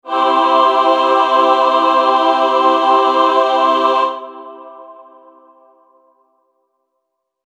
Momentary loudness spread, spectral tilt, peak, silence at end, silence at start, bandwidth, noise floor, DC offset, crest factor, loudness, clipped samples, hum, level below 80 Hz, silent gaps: 7 LU; -1.5 dB/octave; 0 dBFS; 2.55 s; 0.05 s; 9.6 kHz; -73 dBFS; under 0.1%; 14 dB; -12 LUFS; under 0.1%; none; -72 dBFS; none